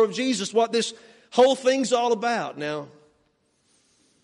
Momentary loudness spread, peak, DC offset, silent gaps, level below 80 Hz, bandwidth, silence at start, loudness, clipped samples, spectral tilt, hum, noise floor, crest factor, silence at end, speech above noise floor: 12 LU; -4 dBFS; under 0.1%; none; -72 dBFS; 11.5 kHz; 0 s; -23 LUFS; under 0.1%; -3.5 dB/octave; none; -68 dBFS; 20 dB; 1.35 s; 45 dB